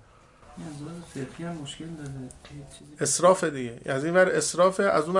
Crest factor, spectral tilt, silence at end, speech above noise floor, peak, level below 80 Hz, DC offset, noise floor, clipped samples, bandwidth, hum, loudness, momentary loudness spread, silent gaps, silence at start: 20 dB; -4 dB/octave; 0 s; 28 dB; -6 dBFS; -58 dBFS; under 0.1%; -54 dBFS; under 0.1%; 11.5 kHz; none; -24 LUFS; 21 LU; none; 0.5 s